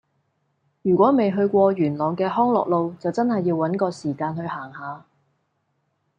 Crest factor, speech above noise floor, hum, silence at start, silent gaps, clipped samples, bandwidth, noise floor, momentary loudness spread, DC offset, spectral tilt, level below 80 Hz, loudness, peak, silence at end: 18 dB; 51 dB; none; 0.85 s; none; under 0.1%; 9.4 kHz; -71 dBFS; 14 LU; under 0.1%; -8.5 dB/octave; -68 dBFS; -21 LUFS; -4 dBFS; 1.2 s